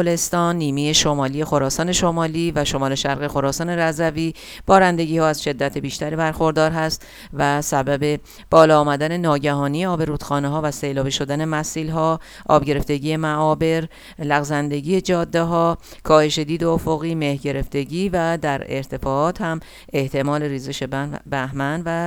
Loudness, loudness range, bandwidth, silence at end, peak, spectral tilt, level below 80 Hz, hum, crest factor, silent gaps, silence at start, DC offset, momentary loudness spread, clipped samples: -20 LUFS; 4 LU; 18 kHz; 0 s; 0 dBFS; -5 dB/octave; -42 dBFS; none; 20 dB; none; 0 s; under 0.1%; 9 LU; under 0.1%